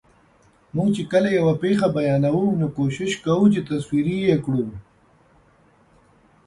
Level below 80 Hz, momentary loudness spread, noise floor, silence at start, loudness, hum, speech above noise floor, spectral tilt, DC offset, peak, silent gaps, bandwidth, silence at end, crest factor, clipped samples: -54 dBFS; 7 LU; -57 dBFS; 0.75 s; -21 LUFS; none; 37 dB; -7.5 dB/octave; under 0.1%; -6 dBFS; none; 11.5 kHz; 1.65 s; 16 dB; under 0.1%